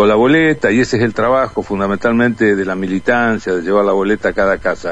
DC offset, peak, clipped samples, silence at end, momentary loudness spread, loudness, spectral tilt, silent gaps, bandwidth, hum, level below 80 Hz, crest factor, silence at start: 1%; 0 dBFS; under 0.1%; 0 s; 6 LU; -14 LUFS; -6.5 dB/octave; none; 10 kHz; none; -42 dBFS; 14 dB; 0 s